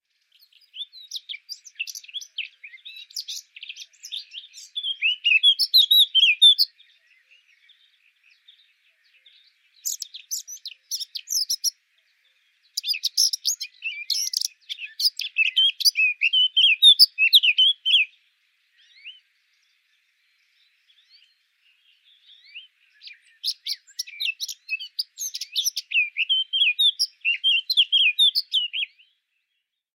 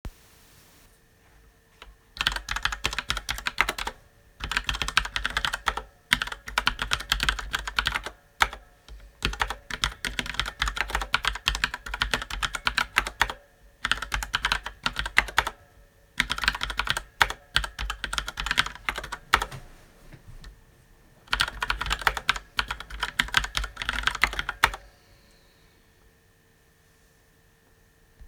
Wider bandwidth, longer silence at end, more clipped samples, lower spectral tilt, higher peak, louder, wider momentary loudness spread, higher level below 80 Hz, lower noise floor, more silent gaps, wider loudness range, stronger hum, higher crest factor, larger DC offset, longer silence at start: second, 16.5 kHz vs over 20 kHz; first, 1.1 s vs 0 s; neither; second, 12.5 dB/octave vs -1.5 dB/octave; about the same, -2 dBFS vs 0 dBFS; first, -19 LUFS vs -27 LUFS; first, 21 LU vs 8 LU; second, under -90 dBFS vs -40 dBFS; first, -79 dBFS vs -61 dBFS; neither; first, 18 LU vs 4 LU; neither; second, 22 dB vs 30 dB; neither; first, 0.75 s vs 0.05 s